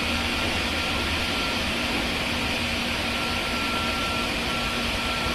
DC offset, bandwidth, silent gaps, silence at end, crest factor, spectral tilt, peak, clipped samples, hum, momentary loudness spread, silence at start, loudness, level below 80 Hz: under 0.1%; 14 kHz; none; 0 s; 14 dB; -3 dB/octave; -12 dBFS; under 0.1%; none; 1 LU; 0 s; -24 LUFS; -38 dBFS